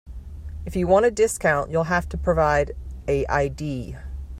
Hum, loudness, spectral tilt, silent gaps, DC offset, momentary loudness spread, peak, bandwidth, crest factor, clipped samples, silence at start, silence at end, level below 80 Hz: none; -22 LUFS; -5.5 dB/octave; none; under 0.1%; 17 LU; -6 dBFS; 15 kHz; 18 dB; under 0.1%; 0.05 s; 0 s; -36 dBFS